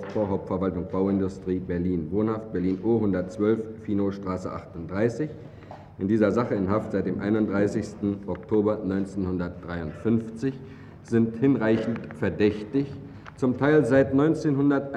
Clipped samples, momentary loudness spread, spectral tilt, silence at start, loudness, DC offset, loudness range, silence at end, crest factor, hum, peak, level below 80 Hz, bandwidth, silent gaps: under 0.1%; 12 LU; -8.5 dB/octave; 0 s; -26 LUFS; under 0.1%; 4 LU; 0 s; 18 dB; none; -8 dBFS; -54 dBFS; 9.6 kHz; none